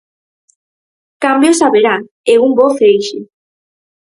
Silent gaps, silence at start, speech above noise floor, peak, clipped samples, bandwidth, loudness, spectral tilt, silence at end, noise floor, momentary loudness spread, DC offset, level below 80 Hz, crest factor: 2.11-2.24 s; 1.2 s; over 80 dB; 0 dBFS; under 0.1%; 11.5 kHz; -11 LUFS; -3.5 dB/octave; 0.8 s; under -90 dBFS; 8 LU; under 0.1%; -60 dBFS; 14 dB